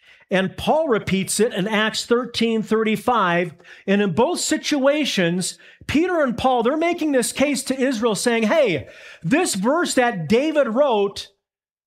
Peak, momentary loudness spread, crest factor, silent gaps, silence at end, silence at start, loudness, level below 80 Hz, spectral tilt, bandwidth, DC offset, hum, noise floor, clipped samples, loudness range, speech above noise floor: -6 dBFS; 5 LU; 14 dB; none; 0.6 s; 0.3 s; -20 LUFS; -54 dBFS; -4 dB/octave; 16 kHz; under 0.1%; none; -83 dBFS; under 0.1%; 1 LU; 63 dB